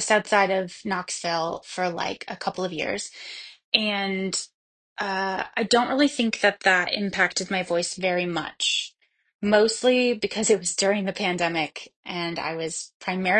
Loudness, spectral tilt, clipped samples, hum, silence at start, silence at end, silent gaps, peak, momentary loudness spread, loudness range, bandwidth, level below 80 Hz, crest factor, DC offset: -24 LUFS; -3 dB/octave; under 0.1%; none; 0 s; 0 s; 3.64-3.72 s, 4.54-4.96 s, 9.35-9.39 s, 11.96-12.03 s, 12.94-13.00 s; -2 dBFS; 11 LU; 5 LU; 10.5 kHz; -64 dBFS; 24 dB; under 0.1%